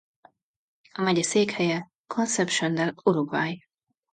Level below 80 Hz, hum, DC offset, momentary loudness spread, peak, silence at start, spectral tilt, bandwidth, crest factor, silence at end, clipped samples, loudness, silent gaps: -72 dBFS; none; under 0.1%; 9 LU; -8 dBFS; 0.95 s; -4 dB/octave; 9.4 kHz; 20 dB; 0.55 s; under 0.1%; -25 LUFS; 1.98-2.04 s